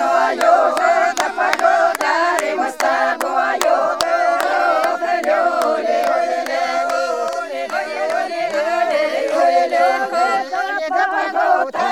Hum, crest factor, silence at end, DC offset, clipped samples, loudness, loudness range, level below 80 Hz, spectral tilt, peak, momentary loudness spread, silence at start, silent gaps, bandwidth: none; 16 dB; 0 s; 0.2%; under 0.1%; -17 LUFS; 3 LU; -66 dBFS; -1.5 dB/octave; 0 dBFS; 6 LU; 0 s; none; 19.5 kHz